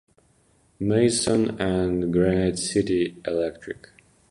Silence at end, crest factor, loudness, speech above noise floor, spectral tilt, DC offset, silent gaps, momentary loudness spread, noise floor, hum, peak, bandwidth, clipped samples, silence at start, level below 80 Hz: 0.55 s; 16 dB; -23 LUFS; 39 dB; -5 dB/octave; under 0.1%; none; 10 LU; -62 dBFS; none; -8 dBFS; 11.5 kHz; under 0.1%; 0.8 s; -46 dBFS